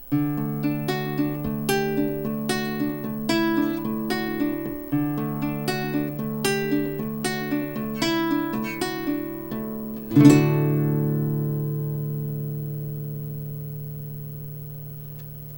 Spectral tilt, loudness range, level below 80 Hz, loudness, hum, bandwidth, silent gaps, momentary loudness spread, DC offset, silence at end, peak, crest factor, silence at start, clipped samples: -6.5 dB/octave; 8 LU; -50 dBFS; -25 LUFS; none; 18 kHz; none; 11 LU; under 0.1%; 0 s; -2 dBFS; 24 dB; 0 s; under 0.1%